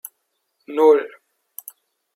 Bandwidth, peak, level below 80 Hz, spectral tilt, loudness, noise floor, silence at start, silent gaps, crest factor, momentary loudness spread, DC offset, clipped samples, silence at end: 16.5 kHz; -2 dBFS; -88 dBFS; -3 dB/octave; -17 LUFS; -73 dBFS; 0.7 s; none; 20 dB; 25 LU; under 0.1%; under 0.1%; 1.1 s